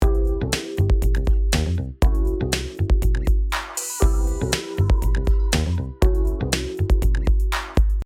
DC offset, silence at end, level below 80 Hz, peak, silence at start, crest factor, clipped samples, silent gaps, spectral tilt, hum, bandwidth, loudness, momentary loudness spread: under 0.1%; 0 s; -20 dBFS; -4 dBFS; 0 s; 16 dB; under 0.1%; none; -5 dB/octave; none; 15.5 kHz; -22 LUFS; 3 LU